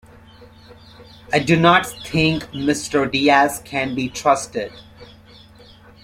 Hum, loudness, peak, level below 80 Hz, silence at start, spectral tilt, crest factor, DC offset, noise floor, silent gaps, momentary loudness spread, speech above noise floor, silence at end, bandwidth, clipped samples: none; -18 LUFS; 0 dBFS; -48 dBFS; 0.4 s; -4.5 dB/octave; 20 dB; under 0.1%; -46 dBFS; none; 9 LU; 27 dB; 1 s; 16 kHz; under 0.1%